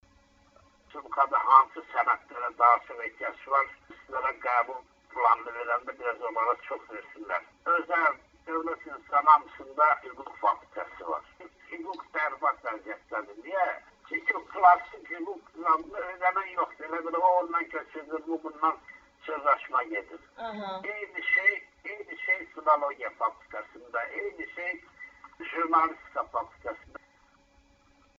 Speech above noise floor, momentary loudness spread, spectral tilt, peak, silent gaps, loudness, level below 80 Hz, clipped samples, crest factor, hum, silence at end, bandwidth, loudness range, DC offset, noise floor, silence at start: 34 dB; 18 LU; -0.5 dB/octave; -6 dBFS; none; -28 LUFS; -68 dBFS; under 0.1%; 24 dB; none; 1.4 s; 7.4 kHz; 6 LU; under 0.1%; -63 dBFS; 0.95 s